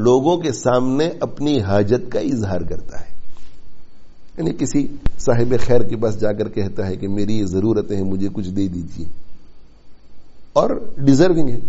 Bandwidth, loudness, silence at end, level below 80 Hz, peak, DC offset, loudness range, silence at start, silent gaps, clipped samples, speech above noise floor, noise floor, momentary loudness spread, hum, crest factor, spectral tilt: 8 kHz; -19 LUFS; 0 s; -34 dBFS; 0 dBFS; under 0.1%; 4 LU; 0 s; none; under 0.1%; 22 dB; -37 dBFS; 10 LU; none; 16 dB; -7 dB/octave